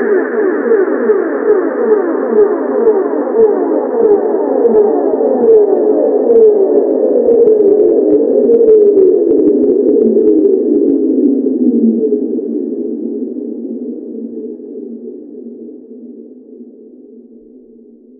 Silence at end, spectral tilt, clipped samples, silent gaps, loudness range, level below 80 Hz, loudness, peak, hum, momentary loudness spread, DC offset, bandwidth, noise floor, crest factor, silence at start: 1 s; -12.5 dB/octave; under 0.1%; none; 16 LU; -56 dBFS; -11 LUFS; 0 dBFS; none; 16 LU; under 0.1%; 2.3 kHz; -39 dBFS; 12 dB; 0 s